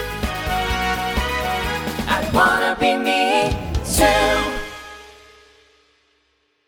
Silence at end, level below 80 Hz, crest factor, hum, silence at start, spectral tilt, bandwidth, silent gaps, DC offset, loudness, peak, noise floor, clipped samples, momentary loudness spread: 1.55 s; -32 dBFS; 20 dB; none; 0 s; -3.5 dB/octave; over 20 kHz; none; under 0.1%; -19 LUFS; 0 dBFS; -65 dBFS; under 0.1%; 10 LU